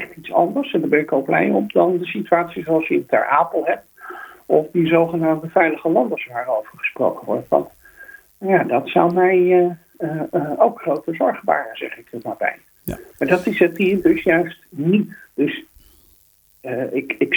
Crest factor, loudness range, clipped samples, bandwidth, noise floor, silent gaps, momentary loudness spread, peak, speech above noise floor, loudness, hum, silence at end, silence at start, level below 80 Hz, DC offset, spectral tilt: 20 dB; 3 LU; under 0.1%; over 20 kHz; -56 dBFS; none; 13 LU; 0 dBFS; 37 dB; -19 LUFS; none; 0 s; 0 s; -56 dBFS; under 0.1%; -7.5 dB/octave